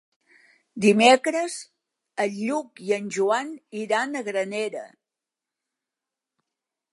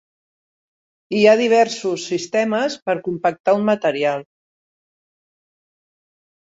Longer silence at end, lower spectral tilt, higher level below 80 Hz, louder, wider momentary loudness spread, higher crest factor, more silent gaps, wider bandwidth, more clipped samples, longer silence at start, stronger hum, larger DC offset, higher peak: second, 2.05 s vs 2.35 s; about the same, -4 dB/octave vs -4.5 dB/octave; second, -80 dBFS vs -68 dBFS; second, -23 LUFS vs -18 LUFS; first, 18 LU vs 10 LU; about the same, 22 dB vs 20 dB; second, none vs 2.82-2.86 s, 3.40-3.44 s; first, 11.5 kHz vs 8 kHz; neither; second, 0.75 s vs 1.1 s; neither; neither; about the same, -4 dBFS vs -2 dBFS